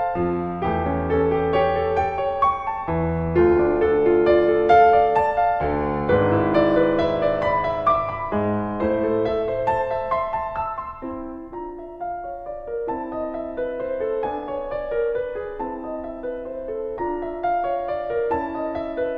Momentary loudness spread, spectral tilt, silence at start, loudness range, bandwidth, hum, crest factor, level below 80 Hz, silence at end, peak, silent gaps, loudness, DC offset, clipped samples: 13 LU; -9 dB/octave; 0 s; 10 LU; 6.2 kHz; none; 18 dB; -42 dBFS; 0 s; -4 dBFS; none; -22 LUFS; under 0.1%; under 0.1%